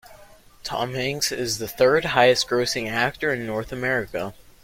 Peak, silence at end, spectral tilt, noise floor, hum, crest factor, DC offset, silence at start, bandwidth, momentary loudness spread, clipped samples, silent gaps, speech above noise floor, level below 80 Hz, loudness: -2 dBFS; 0.3 s; -3.5 dB/octave; -49 dBFS; none; 22 dB; under 0.1%; 0.1 s; 16.5 kHz; 13 LU; under 0.1%; none; 26 dB; -52 dBFS; -22 LUFS